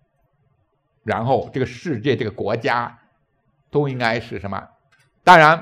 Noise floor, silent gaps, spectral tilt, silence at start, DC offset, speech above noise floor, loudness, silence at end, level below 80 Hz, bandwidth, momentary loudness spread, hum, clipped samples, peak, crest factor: -66 dBFS; none; -6 dB/octave; 1.05 s; under 0.1%; 49 dB; -19 LUFS; 0 s; -56 dBFS; 15 kHz; 18 LU; none; 0.1%; 0 dBFS; 20 dB